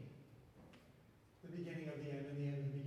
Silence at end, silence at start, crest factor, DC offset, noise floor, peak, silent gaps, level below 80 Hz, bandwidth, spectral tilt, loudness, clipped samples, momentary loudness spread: 0 s; 0 s; 16 dB; under 0.1%; -67 dBFS; -32 dBFS; none; -76 dBFS; 8.8 kHz; -8.5 dB/octave; -47 LUFS; under 0.1%; 22 LU